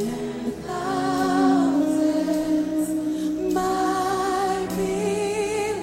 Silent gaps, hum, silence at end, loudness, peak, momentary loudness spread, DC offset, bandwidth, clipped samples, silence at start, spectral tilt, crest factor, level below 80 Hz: none; none; 0 s; -23 LUFS; -8 dBFS; 8 LU; under 0.1%; 16.5 kHz; under 0.1%; 0 s; -5 dB/octave; 14 dB; -50 dBFS